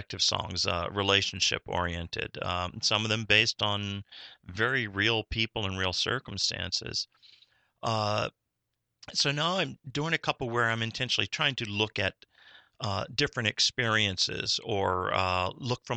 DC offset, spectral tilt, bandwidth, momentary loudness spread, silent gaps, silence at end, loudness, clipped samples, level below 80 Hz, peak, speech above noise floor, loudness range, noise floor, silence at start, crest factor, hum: under 0.1%; -3 dB/octave; 9 kHz; 9 LU; none; 0 s; -28 LUFS; under 0.1%; -56 dBFS; -6 dBFS; 53 dB; 4 LU; -82 dBFS; 0 s; 24 dB; none